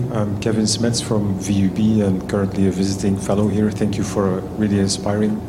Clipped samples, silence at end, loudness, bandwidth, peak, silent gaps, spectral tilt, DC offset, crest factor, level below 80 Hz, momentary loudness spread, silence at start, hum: under 0.1%; 0 s; -19 LUFS; 13.5 kHz; -6 dBFS; none; -6 dB/octave; under 0.1%; 12 dB; -42 dBFS; 4 LU; 0 s; none